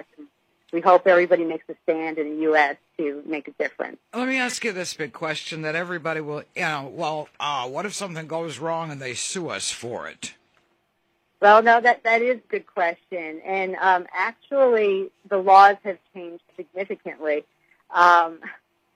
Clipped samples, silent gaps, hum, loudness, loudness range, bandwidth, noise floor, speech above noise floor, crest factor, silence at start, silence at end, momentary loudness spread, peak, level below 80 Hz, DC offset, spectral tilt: under 0.1%; none; none; -22 LUFS; 8 LU; 14 kHz; -70 dBFS; 48 dB; 22 dB; 0.2 s; 0.4 s; 17 LU; 0 dBFS; -76 dBFS; under 0.1%; -3.5 dB/octave